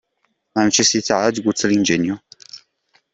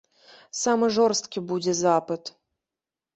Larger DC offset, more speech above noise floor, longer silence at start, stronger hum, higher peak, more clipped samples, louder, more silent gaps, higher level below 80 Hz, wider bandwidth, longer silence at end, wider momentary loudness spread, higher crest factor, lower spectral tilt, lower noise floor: neither; second, 52 dB vs 66 dB; about the same, 0.55 s vs 0.55 s; neither; first, -2 dBFS vs -8 dBFS; neither; first, -17 LUFS vs -24 LUFS; neither; first, -58 dBFS vs -68 dBFS; about the same, 8.4 kHz vs 8.2 kHz; second, 0.55 s vs 0.85 s; first, 22 LU vs 13 LU; about the same, 18 dB vs 18 dB; about the same, -3 dB/octave vs -4 dB/octave; second, -69 dBFS vs -90 dBFS